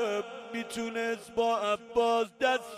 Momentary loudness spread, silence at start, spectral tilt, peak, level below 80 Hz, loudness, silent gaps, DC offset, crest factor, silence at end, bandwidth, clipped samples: 9 LU; 0 s; -3 dB/octave; -14 dBFS; -68 dBFS; -30 LUFS; none; under 0.1%; 16 dB; 0 s; 15 kHz; under 0.1%